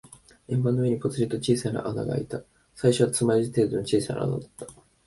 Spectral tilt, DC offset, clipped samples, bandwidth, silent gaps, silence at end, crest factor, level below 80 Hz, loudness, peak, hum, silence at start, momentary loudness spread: -6 dB/octave; under 0.1%; under 0.1%; 12 kHz; none; 0.35 s; 20 dB; -56 dBFS; -26 LUFS; -6 dBFS; none; 0.5 s; 13 LU